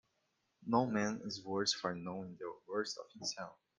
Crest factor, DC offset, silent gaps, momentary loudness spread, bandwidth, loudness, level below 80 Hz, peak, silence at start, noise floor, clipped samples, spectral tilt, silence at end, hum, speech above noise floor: 22 dB; under 0.1%; none; 13 LU; 10 kHz; -39 LUFS; -76 dBFS; -18 dBFS; 0.6 s; -82 dBFS; under 0.1%; -4 dB/octave; 0.25 s; none; 43 dB